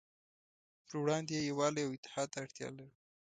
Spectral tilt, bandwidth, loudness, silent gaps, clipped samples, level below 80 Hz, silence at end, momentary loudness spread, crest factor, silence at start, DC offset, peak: -4.5 dB/octave; 9.4 kHz; -38 LUFS; 1.98-2.03 s; under 0.1%; -78 dBFS; 0.35 s; 12 LU; 20 dB; 0.9 s; under 0.1%; -20 dBFS